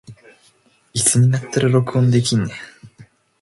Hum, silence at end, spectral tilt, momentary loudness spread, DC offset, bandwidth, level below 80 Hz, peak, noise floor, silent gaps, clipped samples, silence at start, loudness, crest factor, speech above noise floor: none; 0.55 s; -5 dB/octave; 13 LU; under 0.1%; 11.5 kHz; -54 dBFS; -2 dBFS; -56 dBFS; none; under 0.1%; 0.1 s; -17 LUFS; 18 dB; 40 dB